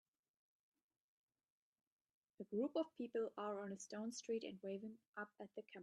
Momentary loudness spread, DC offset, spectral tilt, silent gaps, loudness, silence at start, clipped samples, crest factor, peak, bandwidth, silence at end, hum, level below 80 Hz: 11 LU; under 0.1%; -4.5 dB/octave; 5.08-5.13 s; -48 LUFS; 2.4 s; under 0.1%; 18 dB; -30 dBFS; 11 kHz; 0 s; none; under -90 dBFS